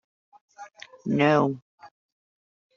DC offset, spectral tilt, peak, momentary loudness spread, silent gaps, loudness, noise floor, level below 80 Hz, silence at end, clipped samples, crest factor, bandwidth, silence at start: under 0.1%; -5.5 dB/octave; -8 dBFS; 26 LU; 1.62-1.78 s; -23 LUFS; -46 dBFS; -68 dBFS; 0.9 s; under 0.1%; 22 dB; 7.4 kHz; 0.6 s